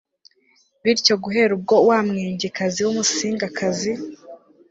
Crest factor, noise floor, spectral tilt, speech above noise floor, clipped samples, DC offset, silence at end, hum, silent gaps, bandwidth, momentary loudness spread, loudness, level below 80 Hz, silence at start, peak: 18 dB; -61 dBFS; -3.5 dB/octave; 41 dB; under 0.1%; under 0.1%; 0.35 s; none; none; 8 kHz; 9 LU; -20 LUFS; -62 dBFS; 0.85 s; -2 dBFS